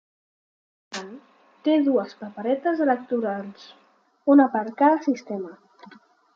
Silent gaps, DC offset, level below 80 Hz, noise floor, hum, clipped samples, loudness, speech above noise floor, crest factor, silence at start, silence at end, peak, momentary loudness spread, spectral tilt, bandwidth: none; under 0.1%; -80 dBFS; -52 dBFS; none; under 0.1%; -23 LUFS; 30 dB; 18 dB; 0.9 s; 0.8 s; -6 dBFS; 18 LU; -6 dB/octave; 7.6 kHz